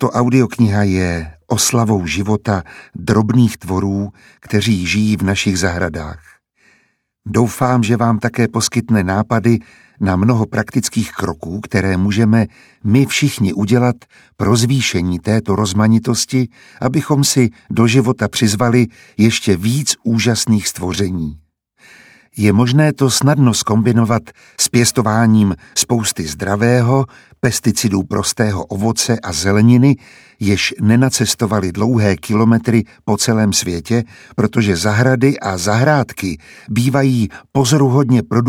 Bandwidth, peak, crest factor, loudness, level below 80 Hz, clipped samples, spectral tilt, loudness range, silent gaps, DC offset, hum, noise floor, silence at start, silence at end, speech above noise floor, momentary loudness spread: 16.5 kHz; 0 dBFS; 14 dB; -15 LUFS; -44 dBFS; under 0.1%; -5 dB/octave; 3 LU; none; under 0.1%; none; -61 dBFS; 0 s; 0 s; 46 dB; 8 LU